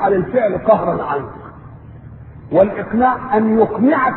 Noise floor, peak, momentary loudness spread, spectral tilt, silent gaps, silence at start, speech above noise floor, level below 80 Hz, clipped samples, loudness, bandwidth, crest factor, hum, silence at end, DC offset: -36 dBFS; 0 dBFS; 10 LU; -12 dB/octave; none; 0 s; 21 dB; -44 dBFS; under 0.1%; -16 LUFS; 4.2 kHz; 16 dB; none; 0 s; under 0.1%